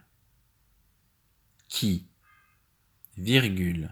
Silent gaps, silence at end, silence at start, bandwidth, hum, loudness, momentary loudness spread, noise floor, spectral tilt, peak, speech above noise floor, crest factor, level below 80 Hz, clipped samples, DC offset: none; 0 s; 1.7 s; over 20 kHz; none; -27 LUFS; 12 LU; -68 dBFS; -5 dB/octave; -4 dBFS; 43 dB; 28 dB; -54 dBFS; under 0.1%; under 0.1%